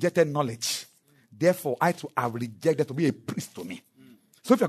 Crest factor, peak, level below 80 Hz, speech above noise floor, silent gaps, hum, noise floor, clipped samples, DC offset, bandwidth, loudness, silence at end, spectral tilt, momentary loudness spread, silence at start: 20 dB; -6 dBFS; -70 dBFS; 31 dB; none; none; -58 dBFS; under 0.1%; under 0.1%; 13.5 kHz; -27 LUFS; 0 s; -5 dB/octave; 15 LU; 0 s